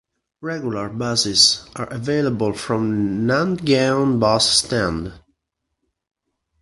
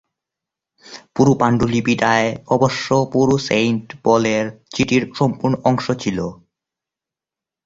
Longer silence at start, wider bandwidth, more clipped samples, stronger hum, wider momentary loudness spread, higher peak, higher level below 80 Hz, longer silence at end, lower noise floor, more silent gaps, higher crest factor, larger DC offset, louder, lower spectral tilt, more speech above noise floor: second, 0.4 s vs 0.9 s; first, 11.5 kHz vs 7.8 kHz; neither; neither; first, 13 LU vs 6 LU; about the same, 0 dBFS vs -2 dBFS; about the same, -48 dBFS vs -48 dBFS; first, 1.45 s vs 1.3 s; second, -77 dBFS vs -88 dBFS; neither; about the same, 20 dB vs 18 dB; neither; about the same, -18 LUFS vs -18 LUFS; second, -3.5 dB/octave vs -6 dB/octave; second, 58 dB vs 71 dB